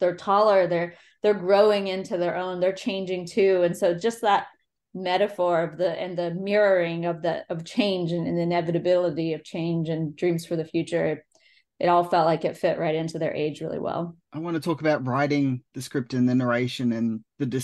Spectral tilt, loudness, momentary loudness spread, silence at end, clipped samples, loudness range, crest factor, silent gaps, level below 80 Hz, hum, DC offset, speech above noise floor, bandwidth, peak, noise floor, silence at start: -6.5 dB/octave; -25 LUFS; 9 LU; 0 s; under 0.1%; 3 LU; 18 dB; none; -70 dBFS; none; under 0.1%; 37 dB; 12.5 kHz; -6 dBFS; -61 dBFS; 0 s